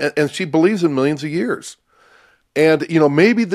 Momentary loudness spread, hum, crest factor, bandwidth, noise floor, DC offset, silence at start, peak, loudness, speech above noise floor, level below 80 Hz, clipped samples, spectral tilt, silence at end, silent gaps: 11 LU; none; 16 dB; 14 kHz; -53 dBFS; under 0.1%; 0 s; 0 dBFS; -17 LUFS; 37 dB; -62 dBFS; under 0.1%; -6 dB/octave; 0 s; none